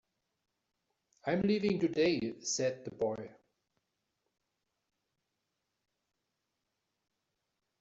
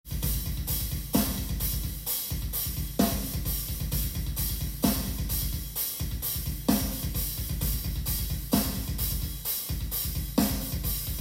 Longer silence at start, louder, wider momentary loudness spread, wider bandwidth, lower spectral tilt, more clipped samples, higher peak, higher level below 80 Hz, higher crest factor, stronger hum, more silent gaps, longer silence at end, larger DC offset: first, 1.25 s vs 0.05 s; second, -33 LUFS vs -29 LUFS; first, 11 LU vs 4 LU; second, 8 kHz vs 16.5 kHz; about the same, -5 dB/octave vs -4.5 dB/octave; neither; second, -20 dBFS vs -10 dBFS; second, -72 dBFS vs -34 dBFS; about the same, 20 dB vs 20 dB; neither; neither; first, 4.5 s vs 0 s; neither